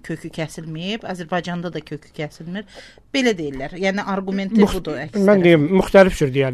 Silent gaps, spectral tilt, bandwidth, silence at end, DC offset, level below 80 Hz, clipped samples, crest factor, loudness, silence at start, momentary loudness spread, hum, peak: none; -6.5 dB/octave; 13.5 kHz; 0 s; 0.2%; -40 dBFS; under 0.1%; 18 dB; -19 LUFS; 0.05 s; 17 LU; none; 0 dBFS